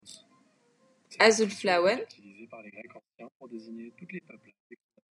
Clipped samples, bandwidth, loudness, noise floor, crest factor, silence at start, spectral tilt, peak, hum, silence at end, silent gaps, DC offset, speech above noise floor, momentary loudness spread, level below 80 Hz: under 0.1%; 11.5 kHz; -25 LUFS; -67 dBFS; 28 dB; 1.1 s; -3 dB/octave; -4 dBFS; none; 1 s; 3.35-3.40 s; under 0.1%; 37 dB; 28 LU; under -90 dBFS